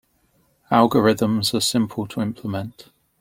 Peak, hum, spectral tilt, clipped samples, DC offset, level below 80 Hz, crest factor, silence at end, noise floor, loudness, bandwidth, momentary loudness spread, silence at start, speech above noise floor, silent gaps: -2 dBFS; none; -5 dB/octave; under 0.1%; under 0.1%; -58 dBFS; 20 dB; 0.4 s; -63 dBFS; -20 LUFS; 16.5 kHz; 12 LU; 0.7 s; 43 dB; none